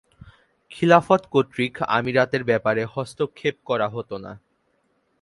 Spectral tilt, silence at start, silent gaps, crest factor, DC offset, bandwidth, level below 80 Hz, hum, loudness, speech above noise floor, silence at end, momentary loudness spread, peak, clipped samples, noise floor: -6.5 dB/octave; 0.7 s; none; 22 dB; under 0.1%; 11.5 kHz; -60 dBFS; none; -22 LUFS; 46 dB; 0.85 s; 13 LU; 0 dBFS; under 0.1%; -68 dBFS